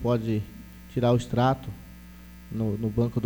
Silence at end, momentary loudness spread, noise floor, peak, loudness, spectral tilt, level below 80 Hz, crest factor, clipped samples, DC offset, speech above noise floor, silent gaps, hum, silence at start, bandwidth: 0 s; 22 LU; -46 dBFS; -10 dBFS; -27 LUFS; -8 dB/octave; -46 dBFS; 16 dB; under 0.1%; under 0.1%; 20 dB; none; none; 0 s; over 20 kHz